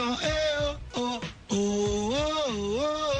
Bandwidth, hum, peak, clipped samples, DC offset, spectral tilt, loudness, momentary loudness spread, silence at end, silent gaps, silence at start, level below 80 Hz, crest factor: 10 kHz; none; -16 dBFS; under 0.1%; under 0.1%; -4 dB/octave; -28 LUFS; 5 LU; 0 s; none; 0 s; -44 dBFS; 12 dB